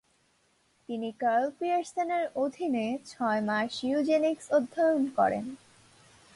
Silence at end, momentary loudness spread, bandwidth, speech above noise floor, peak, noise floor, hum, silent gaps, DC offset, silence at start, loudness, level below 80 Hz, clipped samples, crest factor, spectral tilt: 0.8 s; 10 LU; 11.5 kHz; 41 dB; -14 dBFS; -69 dBFS; none; none; under 0.1%; 0.9 s; -29 LUFS; -72 dBFS; under 0.1%; 16 dB; -5 dB/octave